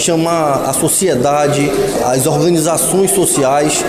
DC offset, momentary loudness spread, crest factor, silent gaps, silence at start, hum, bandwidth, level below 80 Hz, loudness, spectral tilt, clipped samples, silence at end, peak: under 0.1%; 3 LU; 10 dB; none; 0 s; none; 16 kHz; -42 dBFS; -12 LUFS; -4 dB/octave; under 0.1%; 0 s; -2 dBFS